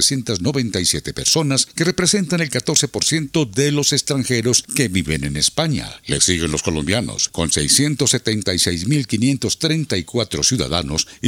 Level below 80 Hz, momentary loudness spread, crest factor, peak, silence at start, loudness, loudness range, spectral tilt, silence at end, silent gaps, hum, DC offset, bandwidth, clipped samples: -42 dBFS; 5 LU; 18 dB; 0 dBFS; 0 s; -17 LUFS; 1 LU; -3.5 dB/octave; 0 s; none; none; under 0.1%; 17 kHz; under 0.1%